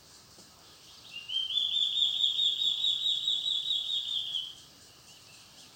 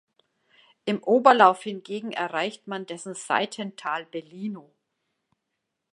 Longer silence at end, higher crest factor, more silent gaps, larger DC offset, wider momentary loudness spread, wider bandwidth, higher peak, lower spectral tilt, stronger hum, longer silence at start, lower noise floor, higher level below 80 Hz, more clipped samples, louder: second, 0 s vs 1.3 s; about the same, 20 dB vs 24 dB; neither; neither; second, 12 LU vs 17 LU; first, 16.5 kHz vs 11 kHz; second, -14 dBFS vs -2 dBFS; second, 1 dB/octave vs -4 dB/octave; neither; second, 0.1 s vs 0.85 s; second, -55 dBFS vs -81 dBFS; first, -74 dBFS vs -82 dBFS; neither; second, -27 LUFS vs -24 LUFS